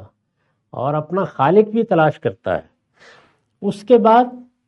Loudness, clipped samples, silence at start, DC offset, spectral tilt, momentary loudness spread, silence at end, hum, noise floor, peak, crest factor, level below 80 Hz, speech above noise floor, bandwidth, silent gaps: -17 LUFS; under 0.1%; 0 s; under 0.1%; -8 dB/octave; 13 LU; 0.25 s; none; -68 dBFS; 0 dBFS; 18 dB; -62 dBFS; 52 dB; 11 kHz; none